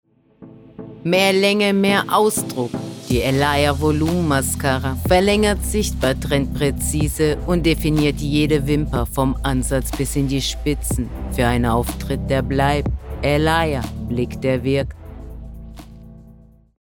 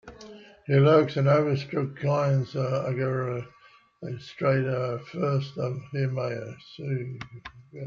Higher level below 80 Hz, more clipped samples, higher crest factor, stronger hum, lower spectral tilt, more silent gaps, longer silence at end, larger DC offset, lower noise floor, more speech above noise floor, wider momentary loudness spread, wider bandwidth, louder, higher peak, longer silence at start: first, -30 dBFS vs -64 dBFS; neither; about the same, 16 dB vs 20 dB; neither; second, -5 dB/octave vs -8 dB/octave; neither; first, 0.5 s vs 0 s; neither; about the same, -47 dBFS vs -47 dBFS; first, 28 dB vs 21 dB; second, 10 LU vs 20 LU; first, over 20 kHz vs 6.8 kHz; first, -19 LUFS vs -26 LUFS; first, -4 dBFS vs -8 dBFS; first, 0.4 s vs 0.05 s